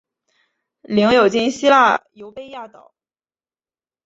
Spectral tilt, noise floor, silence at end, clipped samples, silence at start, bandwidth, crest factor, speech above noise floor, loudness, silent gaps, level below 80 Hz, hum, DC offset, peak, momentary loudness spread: -4.5 dB/octave; under -90 dBFS; 1.4 s; under 0.1%; 0.9 s; 8 kHz; 18 dB; over 74 dB; -15 LUFS; none; -58 dBFS; none; under 0.1%; -2 dBFS; 23 LU